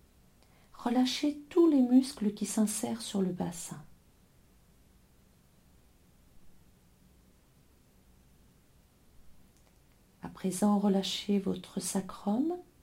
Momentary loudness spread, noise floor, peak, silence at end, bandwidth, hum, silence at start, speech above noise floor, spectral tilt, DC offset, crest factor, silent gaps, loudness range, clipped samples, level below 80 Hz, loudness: 13 LU; -63 dBFS; -14 dBFS; 0.2 s; 16.5 kHz; none; 0.8 s; 33 dB; -5 dB/octave; under 0.1%; 20 dB; none; 13 LU; under 0.1%; -66 dBFS; -31 LUFS